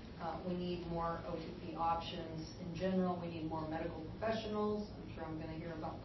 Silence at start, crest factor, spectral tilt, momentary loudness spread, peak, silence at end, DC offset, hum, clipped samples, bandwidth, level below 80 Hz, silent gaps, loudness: 0 s; 16 dB; -5.5 dB/octave; 8 LU; -26 dBFS; 0 s; under 0.1%; none; under 0.1%; 6 kHz; -56 dBFS; none; -41 LUFS